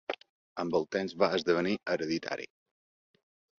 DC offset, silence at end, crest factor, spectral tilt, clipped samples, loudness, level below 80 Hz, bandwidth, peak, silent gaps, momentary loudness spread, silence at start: under 0.1%; 1.15 s; 22 dB; -5.5 dB/octave; under 0.1%; -32 LUFS; -70 dBFS; 7.4 kHz; -12 dBFS; 0.30-0.56 s; 13 LU; 0.1 s